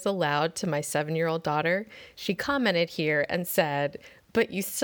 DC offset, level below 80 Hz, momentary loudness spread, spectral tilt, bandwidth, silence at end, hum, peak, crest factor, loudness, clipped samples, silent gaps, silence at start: under 0.1%; -64 dBFS; 6 LU; -4.5 dB/octave; over 20 kHz; 0 s; none; -10 dBFS; 18 dB; -27 LUFS; under 0.1%; none; 0 s